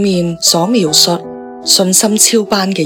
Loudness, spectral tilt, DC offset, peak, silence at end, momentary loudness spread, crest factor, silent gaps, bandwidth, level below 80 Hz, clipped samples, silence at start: -10 LUFS; -3 dB/octave; under 0.1%; 0 dBFS; 0 s; 10 LU; 12 dB; none; over 20 kHz; -50 dBFS; 0.4%; 0 s